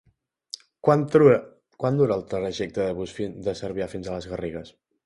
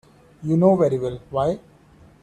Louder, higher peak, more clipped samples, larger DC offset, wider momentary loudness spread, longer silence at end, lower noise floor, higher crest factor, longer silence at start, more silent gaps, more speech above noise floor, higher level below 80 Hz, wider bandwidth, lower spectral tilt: second, -24 LUFS vs -21 LUFS; about the same, -4 dBFS vs -4 dBFS; neither; neither; about the same, 16 LU vs 14 LU; second, 0.35 s vs 0.65 s; second, -46 dBFS vs -51 dBFS; about the same, 20 dB vs 18 dB; first, 0.85 s vs 0.4 s; neither; second, 22 dB vs 31 dB; about the same, -54 dBFS vs -54 dBFS; first, 11.5 kHz vs 9.4 kHz; second, -7 dB/octave vs -9 dB/octave